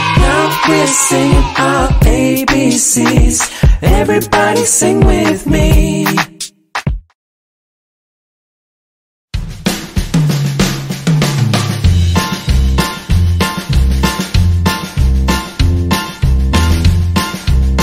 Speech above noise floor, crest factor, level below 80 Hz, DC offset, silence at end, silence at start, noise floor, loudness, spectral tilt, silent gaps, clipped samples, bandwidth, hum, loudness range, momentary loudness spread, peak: over 80 dB; 12 dB; -16 dBFS; under 0.1%; 0 s; 0 s; under -90 dBFS; -12 LUFS; -4.5 dB/octave; 7.15-9.28 s; under 0.1%; 16.5 kHz; none; 10 LU; 8 LU; 0 dBFS